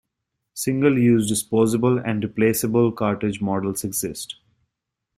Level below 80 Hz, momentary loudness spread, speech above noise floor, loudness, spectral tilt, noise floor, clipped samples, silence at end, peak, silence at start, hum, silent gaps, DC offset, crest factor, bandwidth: -56 dBFS; 11 LU; 61 dB; -21 LUFS; -5.5 dB/octave; -82 dBFS; under 0.1%; 0.85 s; -4 dBFS; 0.55 s; none; none; under 0.1%; 18 dB; 16 kHz